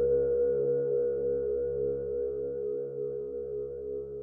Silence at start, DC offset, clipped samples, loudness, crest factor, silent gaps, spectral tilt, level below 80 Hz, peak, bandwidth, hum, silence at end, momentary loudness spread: 0 s; under 0.1%; under 0.1%; -31 LUFS; 12 dB; none; -12.5 dB/octave; -54 dBFS; -18 dBFS; 1.6 kHz; none; 0 s; 9 LU